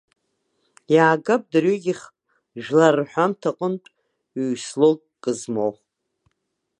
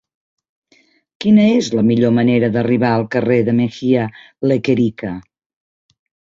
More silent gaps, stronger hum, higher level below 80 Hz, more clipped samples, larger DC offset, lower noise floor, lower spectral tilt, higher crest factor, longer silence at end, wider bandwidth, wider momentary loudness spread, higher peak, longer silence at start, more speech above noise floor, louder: neither; neither; second, -74 dBFS vs -54 dBFS; neither; neither; first, -76 dBFS vs -56 dBFS; second, -5.5 dB/octave vs -7.5 dB/octave; first, 20 dB vs 14 dB; about the same, 1.1 s vs 1.1 s; first, 11 kHz vs 7.6 kHz; first, 13 LU vs 10 LU; about the same, -2 dBFS vs -2 dBFS; second, 0.9 s vs 1.2 s; first, 56 dB vs 41 dB; second, -21 LUFS vs -15 LUFS